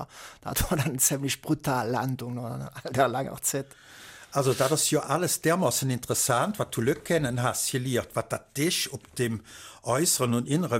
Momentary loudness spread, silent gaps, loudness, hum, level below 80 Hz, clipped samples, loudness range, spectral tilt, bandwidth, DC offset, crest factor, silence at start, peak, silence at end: 12 LU; none; -27 LUFS; none; -50 dBFS; under 0.1%; 3 LU; -4 dB/octave; 16.5 kHz; under 0.1%; 18 dB; 0 s; -8 dBFS; 0 s